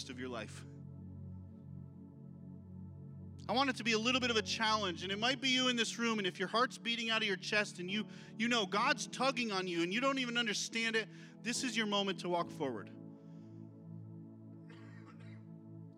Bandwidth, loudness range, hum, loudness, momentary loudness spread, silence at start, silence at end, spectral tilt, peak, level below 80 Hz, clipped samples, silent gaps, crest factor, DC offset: 15 kHz; 12 LU; none; -35 LUFS; 21 LU; 0 s; 0 s; -3 dB/octave; -16 dBFS; -80 dBFS; under 0.1%; none; 22 dB; under 0.1%